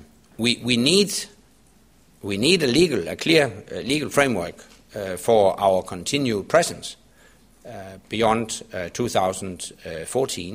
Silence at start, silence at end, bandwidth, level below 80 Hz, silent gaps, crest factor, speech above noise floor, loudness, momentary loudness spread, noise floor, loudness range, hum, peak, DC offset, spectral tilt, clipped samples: 0.4 s; 0 s; 15.5 kHz; -54 dBFS; none; 22 dB; 34 dB; -21 LUFS; 17 LU; -56 dBFS; 5 LU; none; -2 dBFS; under 0.1%; -4 dB/octave; under 0.1%